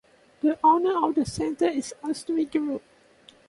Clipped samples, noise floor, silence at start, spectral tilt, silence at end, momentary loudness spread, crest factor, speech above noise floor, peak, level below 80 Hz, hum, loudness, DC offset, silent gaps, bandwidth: under 0.1%; -55 dBFS; 0.45 s; -5 dB/octave; 0.7 s; 12 LU; 16 dB; 31 dB; -10 dBFS; -58 dBFS; none; -25 LUFS; under 0.1%; none; 11.5 kHz